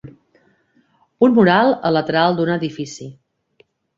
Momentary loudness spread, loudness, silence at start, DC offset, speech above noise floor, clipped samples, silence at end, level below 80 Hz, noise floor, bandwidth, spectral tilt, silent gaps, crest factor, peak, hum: 17 LU; -16 LUFS; 0.05 s; under 0.1%; 44 dB; under 0.1%; 0.85 s; -58 dBFS; -60 dBFS; 7.6 kHz; -6.5 dB/octave; none; 16 dB; -2 dBFS; none